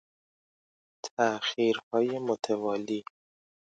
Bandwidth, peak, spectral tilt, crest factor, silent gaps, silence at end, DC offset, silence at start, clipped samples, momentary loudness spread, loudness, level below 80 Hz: 9.2 kHz; -12 dBFS; -4 dB/octave; 18 dB; 1.11-1.17 s, 1.83-1.91 s; 0.75 s; under 0.1%; 1.05 s; under 0.1%; 9 LU; -30 LUFS; -80 dBFS